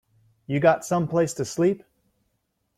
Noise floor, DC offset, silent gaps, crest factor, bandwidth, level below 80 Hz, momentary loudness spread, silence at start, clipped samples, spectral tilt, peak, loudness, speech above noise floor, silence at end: -74 dBFS; under 0.1%; none; 20 dB; 15.5 kHz; -62 dBFS; 7 LU; 0.5 s; under 0.1%; -6 dB/octave; -6 dBFS; -24 LUFS; 52 dB; 1 s